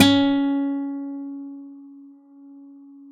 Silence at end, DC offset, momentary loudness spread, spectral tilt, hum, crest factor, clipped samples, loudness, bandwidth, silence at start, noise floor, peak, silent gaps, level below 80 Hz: 0 s; under 0.1%; 26 LU; -4.5 dB/octave; none; 22 dB; under 0.1%; -23 LUFS; 10 kHz; 0 s; -46 dBFS; 0 dBFS; none; -62 dBFS